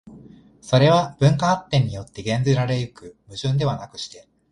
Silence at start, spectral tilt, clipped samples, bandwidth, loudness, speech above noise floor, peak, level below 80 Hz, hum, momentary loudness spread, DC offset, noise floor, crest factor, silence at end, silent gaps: 0.05 s; -6.5 dB/octave; under 0.1%; 10.5 kHz; -21 LUFS; 26 dB; -2 dBFS; -50 dBFS; none; 16 LU; under 0.1%; -47 dBFS; 18 dB; 0.35 s; none